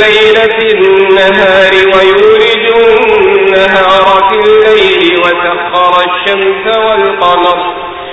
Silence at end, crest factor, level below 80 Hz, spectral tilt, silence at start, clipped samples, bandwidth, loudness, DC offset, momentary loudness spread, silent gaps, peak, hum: 0 s; 6 dB; -40 dBFS; -4.5 dB/octave; 0 s; 2%; 8 kHz; -6 LUFS; 0.4%; 5 LU; none; 0 dBFS; none